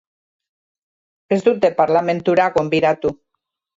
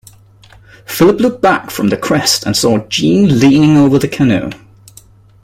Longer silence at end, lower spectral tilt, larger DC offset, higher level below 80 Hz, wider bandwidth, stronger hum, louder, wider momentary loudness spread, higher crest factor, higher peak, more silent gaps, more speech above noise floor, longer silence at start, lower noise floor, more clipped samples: second, 0.65 s vs 0.9 s; first, -6.5 dB/octave vs -5 dB/octave; neither; second, -58 dBFS vs -44 dBFS; second, 7.8 kHz vs 16.5 kHz; neither; second, -17 LUFS vs -11 LUFS; about the same, 6 LU vs 7 LU; about the same, 16 dB vs 12 dB; about the same, -2 dBFS vs 0 dBFS; neither; first, 61 dB vs 32 dB; first, 1.3 s vs 0.9 s; first, -77 dBFS vs -42 dBFS; neither